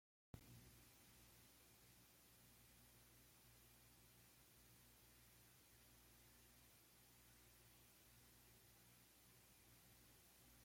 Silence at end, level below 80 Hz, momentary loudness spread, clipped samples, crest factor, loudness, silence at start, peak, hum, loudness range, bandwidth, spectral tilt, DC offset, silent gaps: 0 s; -80 dBFS; 2 LU; under 0.1%; 28 dB; -69 LUFS; 0.35 s; -42 dBFS; 60 Hz at -80 dBFS; 1 LU; 16.5 kHz; -3 dB/octave; under 0.1%; none